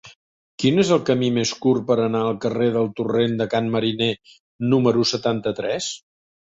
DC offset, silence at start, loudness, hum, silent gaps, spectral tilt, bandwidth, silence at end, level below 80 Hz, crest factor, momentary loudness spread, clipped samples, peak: under 0.1%; 0.05 s; -21 LUFS; none; 0.16-0.58 s, 4.40-4.59 s; -5.5 dB/octave; 8 kHz; 0.6 s; -58 dBFS; 16 dB; 7 LU; under 0.1%; -4 dBFS